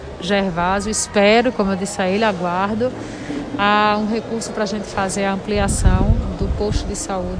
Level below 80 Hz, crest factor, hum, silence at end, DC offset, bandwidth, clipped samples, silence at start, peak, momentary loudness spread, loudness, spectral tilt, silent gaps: -28 dBFS; 18 dB; none; 0 s; under 0.1%; 10.5 kHz; under 0.1%; 0 s; -2 dBFS; 9 LU; -19 LUFS; -4.5 dB/octave; none